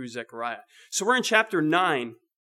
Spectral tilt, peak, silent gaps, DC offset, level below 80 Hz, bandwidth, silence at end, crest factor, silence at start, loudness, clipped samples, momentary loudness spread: -3 dB/octave; -4 dBFS; none; under 0.1%; under -90 dBFS; 15.5 kHz; 0.35 s; 22 dB; 0 s; -24 LUFS; under 0.1%; 15 LU